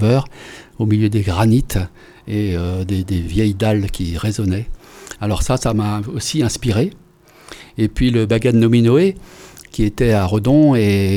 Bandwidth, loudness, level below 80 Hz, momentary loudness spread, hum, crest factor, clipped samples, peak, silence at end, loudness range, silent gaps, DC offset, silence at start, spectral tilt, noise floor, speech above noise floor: 15.5 kHz; -17 LUFS; -32 dBFS; 17 LU; none; 14 dB; under 0.1%; -2 dBFS; 0 s; 5 LU; none; under 0.1%; 0 s; -6.5 dB/octave; -45 dBFS; 30 dB